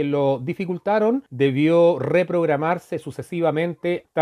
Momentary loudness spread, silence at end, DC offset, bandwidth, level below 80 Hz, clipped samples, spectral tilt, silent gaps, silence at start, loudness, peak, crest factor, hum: 9 LU; 0 s; under 0.1%; 12 kHz; -66 dBFS; under 0.1%; -8 dB/octave; none; 0 s; -21 LUFS; -4 dBFS; 16 dB; none